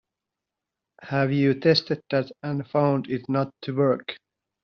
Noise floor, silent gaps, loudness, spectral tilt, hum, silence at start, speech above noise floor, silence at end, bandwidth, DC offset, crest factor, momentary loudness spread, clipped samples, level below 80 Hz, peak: -86 dBFS; none; -24 LUFS; -5 dB/octave; none; 1 s; 63 dB; 0.45 s; 6.6 kHz; under 0.1%; 20 dB; 9 LU; under 0.1%; -66 dBFS; -6 dBFS